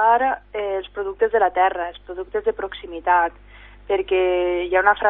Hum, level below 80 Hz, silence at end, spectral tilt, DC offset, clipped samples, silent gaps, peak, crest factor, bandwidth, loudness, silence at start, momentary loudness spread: 50 Hz at -45 dBFS; -48 dBFS; 0 s; -9 dB/octave; under 0.1%; under 0.1%; none; -2 dBFS; 18 dB; 3.9 kHz; -21 LUFS; 0 s; 12 LU